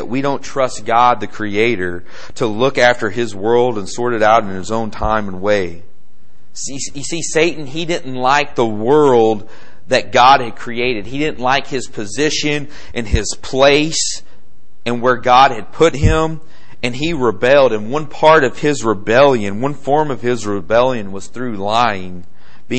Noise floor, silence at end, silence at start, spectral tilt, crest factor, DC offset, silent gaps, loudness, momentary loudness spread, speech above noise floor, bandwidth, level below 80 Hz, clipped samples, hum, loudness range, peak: -54 dBFS; 0 s; 0 s; -4.5 dB/octave; 16 dB; 8%; none; -15 LUFS; 13 LU; 39 dB; 8.8 kHz; -34 dBFS; under 0.1%; none; 5 LU; 0 dBFS